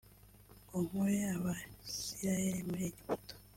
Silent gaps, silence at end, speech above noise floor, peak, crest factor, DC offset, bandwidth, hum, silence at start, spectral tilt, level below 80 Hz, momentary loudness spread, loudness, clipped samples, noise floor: none; 0.1 s; 23 dB; -22 dBFS; 16 dB; under 0.1%; 16.5 kHz; 50 Hz at -50 dBFS; 0.05 s; -5 dB/octave; -62 dBFS; 8 LU; -38 LUFS; under 0.1%; -60 dBFS